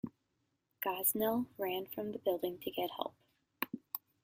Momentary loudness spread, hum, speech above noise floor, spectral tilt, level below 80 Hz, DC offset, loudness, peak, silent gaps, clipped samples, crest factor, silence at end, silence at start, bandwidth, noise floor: 12 LU; none; 45 dB; -3.5 dB/octave; -76 dBFS; under 0.1%; -38 LUFS; -14 dBFS; none; under 0.1%; 24 dB; 0.25 s; 0.05 s; 16 kHz; -82 dBFS